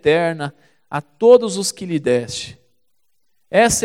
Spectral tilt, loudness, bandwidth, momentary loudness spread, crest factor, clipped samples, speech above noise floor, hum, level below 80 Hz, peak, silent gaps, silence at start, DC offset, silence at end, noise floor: -4 dB/octave; -18 LUFS; 15.5 kHz; 16 LU; 18 dB; under 0.1%; 56 dB; none; -48 dBFS; 0 dBFS; none; 0.05 s; 0.1%; 0 s; -73 dBFS